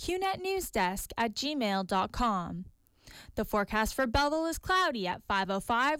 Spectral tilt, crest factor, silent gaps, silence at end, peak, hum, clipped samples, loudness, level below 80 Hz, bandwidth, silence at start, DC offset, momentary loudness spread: -4 dB/octave; 14 dB; none; 0 s; -18 dBFS; none; under 0.1%; -31 LUFS; -48 dBFS; 17 kHz; 0 s; under 0.1%; 7 LU